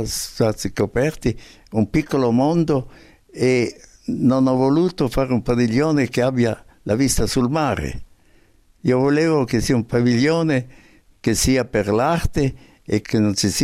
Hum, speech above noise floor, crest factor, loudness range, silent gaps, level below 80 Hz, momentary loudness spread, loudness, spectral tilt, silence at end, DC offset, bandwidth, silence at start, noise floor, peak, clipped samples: none; 35 dB; 14 dB; 2 LU; none; -38 dBFS; 9 LU; -19 LUFS; -5.5 dB/octave; 0 s; under 0.1%; 15.5 kHz; 0 s; -54 dBFS; -4 dBFS; under 0.1%